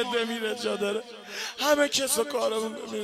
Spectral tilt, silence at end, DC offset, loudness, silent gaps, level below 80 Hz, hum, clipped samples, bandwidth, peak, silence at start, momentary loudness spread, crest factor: -1.5 dB/octave; 0 s; under 0.1%; -27 LUFS; none; -68 dBFS; none; under 0.1%; 16 kHz; -10 dBFS; 0 s; 11 LU; 18 dB